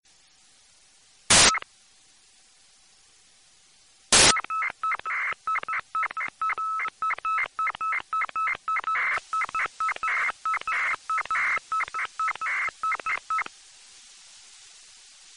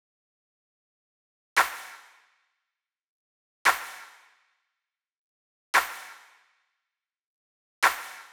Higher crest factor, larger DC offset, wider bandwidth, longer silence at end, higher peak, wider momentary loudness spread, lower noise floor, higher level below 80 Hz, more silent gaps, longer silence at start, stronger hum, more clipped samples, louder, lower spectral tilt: about the same, 24 dB vs 26 dB; neither; second, 10.5 kHz vs over 20 kHz; first, 0.7 s vs 0.1 s; about the same, -4 dBFS vs -6 dBFS; second, 12 LU vs 19 LU; second, -59 dBFS vs -87 dBFS; first, -54 dBFS vs -74 dBFS; second, none vs 3.08-3.65 s, 5.17-5.73 s, 7.26-7.82 s; second, 1.3 s vs 1.55 s; neither; neither; about the same, -24 LUFS vs -26 LUFS; about the same, 0 dB/octave vs 1 dB/octave